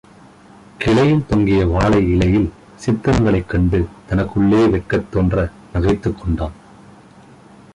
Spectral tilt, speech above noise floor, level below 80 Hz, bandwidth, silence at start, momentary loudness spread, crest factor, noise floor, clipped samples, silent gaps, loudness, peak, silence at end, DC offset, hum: -8 dB/octave; 28 dB; -30 dBFS; 11 kHz; 0.8 s; 8 LU; 14 dB; -44 dBFS; under 0.1%; none; -17 LUFS; -4 dBFS; 1.2 s; under 0.1%; none